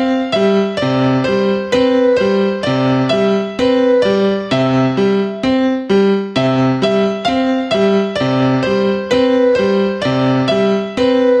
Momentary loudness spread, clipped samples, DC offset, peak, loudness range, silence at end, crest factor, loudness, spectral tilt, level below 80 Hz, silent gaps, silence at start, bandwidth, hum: 3 LU; under 0.1%; under 0.1%; -2 dBFS; 1 LU; 0 s; 12 dB; -14 LUFS; -7 dB/octave; -48 dBFS; none; 0 s; 9.2 kHz; none